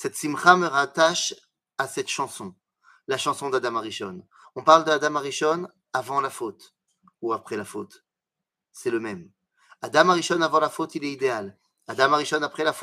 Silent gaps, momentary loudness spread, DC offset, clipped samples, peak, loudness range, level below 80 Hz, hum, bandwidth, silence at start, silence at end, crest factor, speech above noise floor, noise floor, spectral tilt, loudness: none; 19 LU; under 0.1%; under 0.1%; 0 dBFS; 9 LU; -76 dBFS; none; 15.5 kHz; 0 s; 0 s; 24 dB; 63 dB; -87 dBFS; -3 dB/octave; -23 LUFS